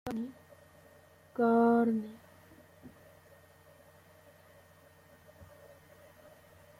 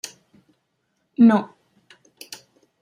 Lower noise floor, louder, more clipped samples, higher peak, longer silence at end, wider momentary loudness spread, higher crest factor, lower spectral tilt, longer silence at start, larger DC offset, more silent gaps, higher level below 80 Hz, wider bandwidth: second, -60 dBFS vs -72 dBFS; second, -30 LUFS vs -17 LUFS; neither; second, -18 dBFS vs -4 dBFS; about the same, 1.35 s vs 1.35 s; first, 30 LU vs 25 LU; about the same, 18 dB vs 18 dB; first, -7.5 dB/octave vs -6 dB/octave; second, 0.05 s vs 1.2 s; neither; neither; about the same, -72 dBFS vs -74 dBFS; about the same, 15.5 kHz vs 15 kHz